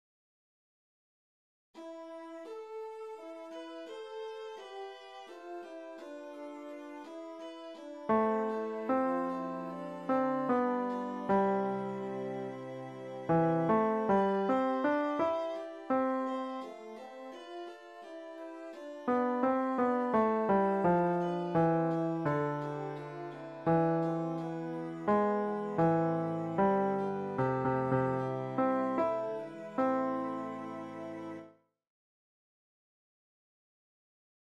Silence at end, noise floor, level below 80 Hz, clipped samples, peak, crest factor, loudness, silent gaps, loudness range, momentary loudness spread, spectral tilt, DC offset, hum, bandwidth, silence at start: 3.1 s; -57 dBFS; -70 dBFS; under 0.1%; -16 dBFS; 18 dB; -32 LUFS; none; 15 LU; 17 LU; -8.5 dB/octave; under 0.1%; none; 9.6 kHz; 1.75 s